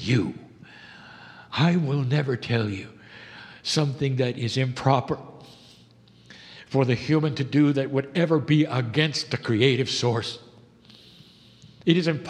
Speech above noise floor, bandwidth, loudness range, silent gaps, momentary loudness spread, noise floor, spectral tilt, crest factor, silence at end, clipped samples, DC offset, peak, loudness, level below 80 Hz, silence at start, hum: 31 dB; 10.5 kHz; 4 LU; none; 22 LU; -54 dBFS; -6 dB/octave; 22 dB; 0 s; under 0.1%; under 0.1%; -2 dBFS; -24 LUFS; -62 dBFS; 0 s; none